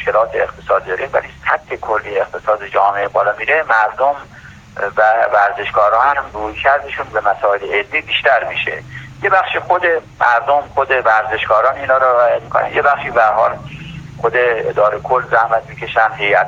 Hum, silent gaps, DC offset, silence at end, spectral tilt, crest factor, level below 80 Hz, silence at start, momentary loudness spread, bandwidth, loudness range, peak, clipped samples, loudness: none; none; under 0.1%; 0 s; -5 dB/octave; 14 dB; -46 dBFS; 0 s; 8 LU; 7.6 kHz; 3 LU; 0 dBFS; under 0.1%; -15 LUFS